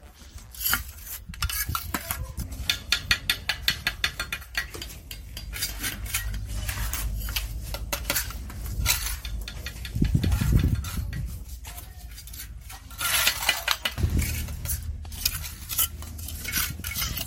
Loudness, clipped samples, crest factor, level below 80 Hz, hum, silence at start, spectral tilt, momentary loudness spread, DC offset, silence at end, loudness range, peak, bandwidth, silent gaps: -28 LUFS; under 0.1%; 26 dB; -34 dBFS; none; 0 s; -2.5 dB/octave; 15 LU; under 0.1%; 0 s; 4 LU; -4 dBFS; 17 kHz; none